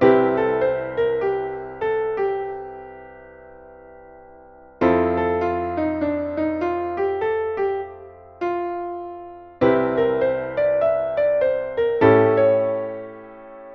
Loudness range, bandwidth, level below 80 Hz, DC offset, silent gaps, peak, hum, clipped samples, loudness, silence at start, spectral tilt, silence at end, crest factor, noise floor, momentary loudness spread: 7 LU; 5.8 kHz; -52 dBFS; under 0.1%; none; -2 dBFS; none; under 0.1%; -21 LUFS; 0 s; -9 dB/octave; 0 s; 20 dB; -46 dBFS; 18 LU